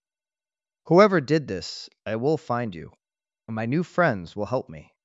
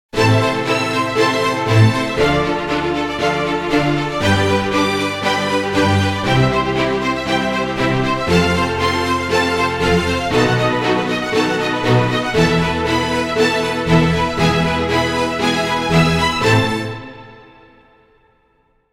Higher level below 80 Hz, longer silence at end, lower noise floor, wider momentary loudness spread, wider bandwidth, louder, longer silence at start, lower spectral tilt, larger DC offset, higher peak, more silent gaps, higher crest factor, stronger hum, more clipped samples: second, -64 dBFS vs -36 dBFS; second, 0.25 s vs 1.5 s; first, under -90 dBFS vs -59 dBFS; first, 18 LU vs 4 LU; second, 8 kHz vs 16 kHz; second, -24 LUFS vs -16 LUFS; first, 0.85 s vs 0.15 s; first, -7 dB/octave vs -5.5 dB/octave; neither; about the same, -2 dBFS vs -2 dBFS; neither; first, 22 dB vs 16 dB; neither; neither